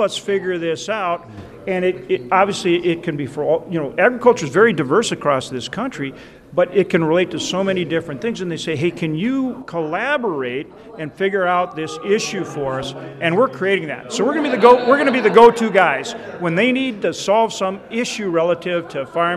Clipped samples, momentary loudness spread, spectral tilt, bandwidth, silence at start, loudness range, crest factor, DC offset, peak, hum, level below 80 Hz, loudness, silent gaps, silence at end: under 0.1%; 11 LU; -5 dB/octave; 12.5 kHz; 0 s; 7 LU; 18 dB; under 0.1%; 0 dBFS; none; -56 dBFS; -18 LUFS; none; 0 s